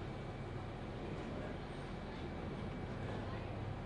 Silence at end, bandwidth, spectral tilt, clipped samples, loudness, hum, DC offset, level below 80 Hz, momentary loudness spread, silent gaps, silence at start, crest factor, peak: 0 s; 11 kHz; -7.5 dB/octave; under 0.1%; -45 LUFS; none; under 0.1%; -54 dBFS; 3 LU; none; 0 s; 12 dB; -32 dBFS